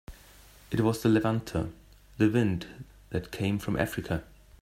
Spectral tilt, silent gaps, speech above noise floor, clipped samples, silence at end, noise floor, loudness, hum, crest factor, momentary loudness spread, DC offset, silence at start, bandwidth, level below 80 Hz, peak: -7 dB/octave; none; 26 dB; under 0.1%; 0.4 s; -54 dBFS; -29 LUFS; none; 20 dB; 11 LU; under 0.1%; 0.1 s; 16 kHz; -50 dBFS; -10 dBFS